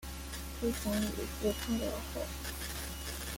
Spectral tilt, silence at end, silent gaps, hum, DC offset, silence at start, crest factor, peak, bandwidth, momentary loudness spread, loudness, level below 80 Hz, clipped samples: -4 dB/octave; 0 s; none; none; under 0.1%; 0 s; 16 dB; -20 dBFS; 17 kHz; 6 LU; -37 LUFS; -44 dBFS; under 0.1%